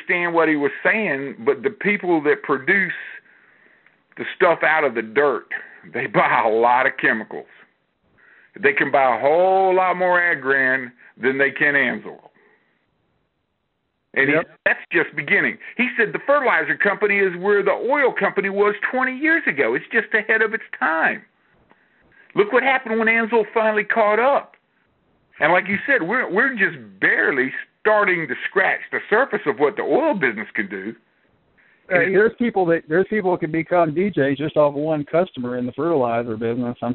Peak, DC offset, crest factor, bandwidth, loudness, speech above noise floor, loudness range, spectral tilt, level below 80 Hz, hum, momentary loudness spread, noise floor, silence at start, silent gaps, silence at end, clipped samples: -2 dBFS; under 0.1%; 18 dB; 4.3 kHz; -19 LUFS; 53 dB; 3 LU; -3.5 dB/octave; -64 dBFS; none; 8 LU; -72 dBFS; 0 s; none; 0 s; under 0.1%